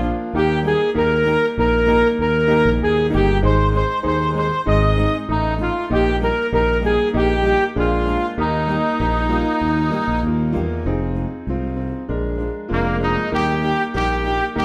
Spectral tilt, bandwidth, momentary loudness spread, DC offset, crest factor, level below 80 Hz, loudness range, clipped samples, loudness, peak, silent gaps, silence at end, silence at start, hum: -8 dB/octave; 8.4 kHz; 7 LU; under 0.1%; 14 dB; -26 dBFS; 5 LU; under 0.1%; -19 LUFS; -4 dBFS; none; 0 s; 0 s; none